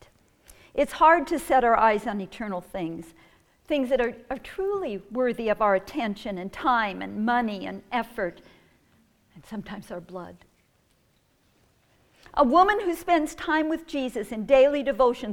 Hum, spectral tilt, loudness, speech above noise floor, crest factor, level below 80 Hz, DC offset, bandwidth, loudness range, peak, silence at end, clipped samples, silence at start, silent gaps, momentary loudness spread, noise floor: none; -5 dB/octave; -25 LUFS; 41 dB; 20 dB; -52 dBFS; under 0.1%; 17.5 kHz; 15 LU; -6 dBFS; 0 s; under 0.1%; 0.5 s; none; 18 LU; -66 dBFS